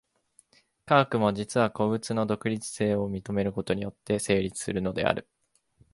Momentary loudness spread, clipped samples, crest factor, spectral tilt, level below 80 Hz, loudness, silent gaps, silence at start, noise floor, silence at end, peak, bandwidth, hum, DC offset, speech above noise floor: 7 LU; under 0.1%; 24 dB; -5.5 dB/octave; -56 dBFS; -28 LUFS; none; 0.85 s; -65 dBFS; 0.7 s; -4 dBFS; 11.5 kHz; none; under 0.1%; 38 dB